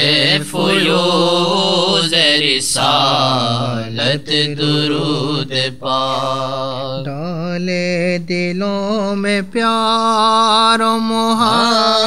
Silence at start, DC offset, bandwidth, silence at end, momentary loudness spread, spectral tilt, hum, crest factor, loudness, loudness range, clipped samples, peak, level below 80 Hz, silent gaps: 0 s; 2%; 15.5 kHz; 0 s; 8 LU; -4 dB/octave; none; 16 dB; -14 LUFS; 6 LU; under 0.1%; 0 dBFS; -52 dBFS; none